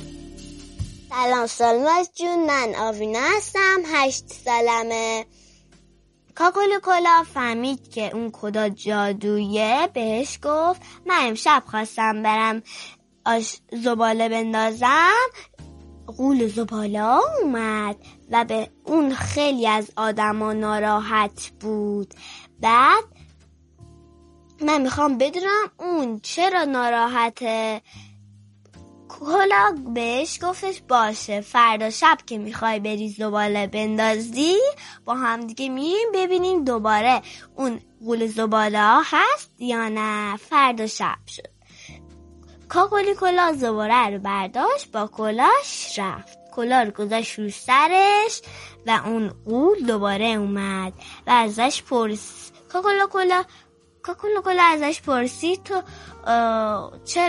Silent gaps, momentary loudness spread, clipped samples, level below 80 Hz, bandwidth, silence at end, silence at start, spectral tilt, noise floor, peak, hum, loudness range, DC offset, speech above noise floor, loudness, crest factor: none; 12 LU; under 0.1%; -54 dBFS; 11.5 kHz; 0 s; 0 s; -3.5 dB/octave; -57 dBFS; -2 dBFS; none; 3 LU; under 0.1%; 36 dB; -21 LUFS; 18 dB